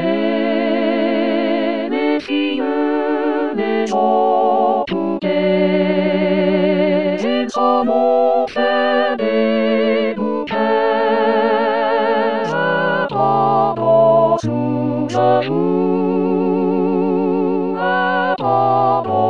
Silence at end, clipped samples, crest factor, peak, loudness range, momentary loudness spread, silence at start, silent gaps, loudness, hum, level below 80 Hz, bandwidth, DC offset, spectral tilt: 0 s; under 0.1%; 14 dB; -2 dBFS; 2 LU; 4 LU; 0 s; none; -16 LUFS; none; -62 dBFS; 7.8 kHz; 0.8%; -7 dB/octave